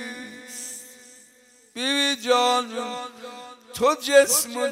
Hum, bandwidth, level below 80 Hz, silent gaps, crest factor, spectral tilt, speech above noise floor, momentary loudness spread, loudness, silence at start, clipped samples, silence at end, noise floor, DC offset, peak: none; 16 kHz; -70 dBFS; none; 20 dB; -0.5 dB/octave; 34 dB; 22 LU; -21 LUFS; 0 s; under 0.1%; 0 s; -55 dBFS; under 0.1%; -4 dBFS